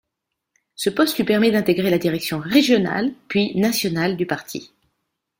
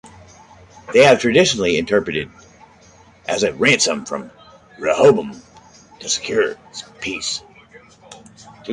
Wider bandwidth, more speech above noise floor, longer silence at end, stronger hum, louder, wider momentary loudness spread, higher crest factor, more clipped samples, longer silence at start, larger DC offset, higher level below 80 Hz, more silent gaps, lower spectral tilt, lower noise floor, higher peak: first, 16.5 kHz vs 11.5 kHz; first, 61 dB vs 31 dB; first, 0.75 s vs 0 s; neither; second, -20 LUFS vs -17 LUFS; second, 8 LU vs 20 LU; about the same, 18 dB vs 18 dB; neither; first, 0.8 s vs 0.05 s; neither; second, -58 dBFS vs -52 dBFS; neither; first, -5 dB/octave vs -3.5 dB/octave; first, -80 dBFS vs -48 dBFS; about the same, -2 dBFS vs -2 dBFS